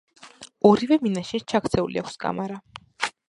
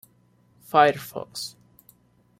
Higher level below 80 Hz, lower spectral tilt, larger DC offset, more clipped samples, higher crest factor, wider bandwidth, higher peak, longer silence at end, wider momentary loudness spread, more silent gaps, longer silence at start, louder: first, -54 dBFS vs -68 dBFS; first, -6 dB/octave vs -4 dB/octave; neither; neither; about the same, 22 dB vs 22 dB; second, 11.5 kHz vs 16 kHz; about the same, -4 dBFS vs -4 dBFS; second, 0.2 s vs 0.9 s; about the same, 16 LU vs 16 LU; neither; second, 0.25 s vs 0.75 s; about the same, -24 LUFS vs -23 LUFS